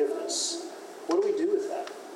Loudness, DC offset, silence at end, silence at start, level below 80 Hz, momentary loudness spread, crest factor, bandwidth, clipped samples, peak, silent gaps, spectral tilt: -29 LUFS; under 0.1%; 0 s; 0 s; under -90 dBFS; 11 LU; 14 dB; 15.5 kHz; under 0.1%; -16 dBFS; none; -1.5 dB/octave